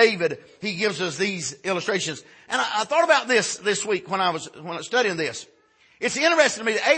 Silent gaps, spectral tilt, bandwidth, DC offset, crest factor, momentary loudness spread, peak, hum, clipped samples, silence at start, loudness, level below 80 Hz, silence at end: none; -2.5 dB/octave; 8.8 kHz; under 0.1%; 20 dB; 12 LU; -4 dBFS; none; under 0.1%; 0 s; -23 LUFS; -72 dBFS; 0 s